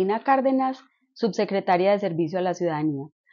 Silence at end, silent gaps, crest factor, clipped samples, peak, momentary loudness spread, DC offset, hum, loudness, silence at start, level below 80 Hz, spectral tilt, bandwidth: 0.25 s; none; 16 dB; under 0.1%; -8 dBFS; 8 LU; under 0.1%; none; -24 LUFS; 0 s; -80 dBFS; -5.5 dB/octave; 7.2 kHz